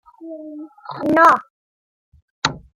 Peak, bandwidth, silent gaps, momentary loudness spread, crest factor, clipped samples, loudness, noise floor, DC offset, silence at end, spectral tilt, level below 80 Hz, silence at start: -2 dBFS; 16.5 kHz; 1.50-2.12 s, 2.22-2.42 s; 23 LU; 20 dB; under 0.1%; -16 LUFS; -35 dBFS; under 0.1%; 0.2 s; -4 dB/octave; -56 dBFS; 0.2 s